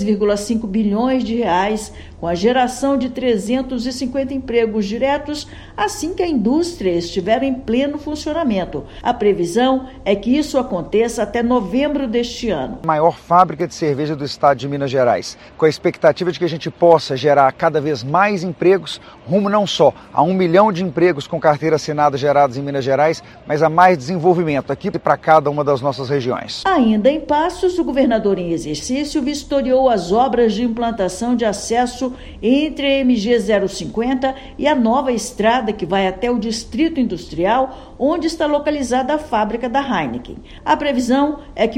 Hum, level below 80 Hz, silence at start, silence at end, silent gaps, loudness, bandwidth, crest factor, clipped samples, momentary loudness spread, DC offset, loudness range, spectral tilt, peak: none; -42 dBFS; 0 s; 0 s; none; -17 LUFS; 15.5 kHz; 16 dB; under 0.1%; 8 LU; under 0.1%; 3 LU; -5.5 dB/octave; 0 dBFS